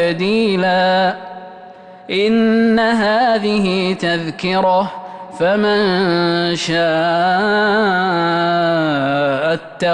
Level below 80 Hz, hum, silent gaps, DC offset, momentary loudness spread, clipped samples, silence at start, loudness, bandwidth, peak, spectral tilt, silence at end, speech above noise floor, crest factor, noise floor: -52 dBFS; none; none; under 0.1%; 6 LU; under 0.1%; 0 s; -15 LUFS; 10 kHz; -6 dBFS; -5.5 dB/octave; 0 s; 23 dB; 10 dB; -38 dBFS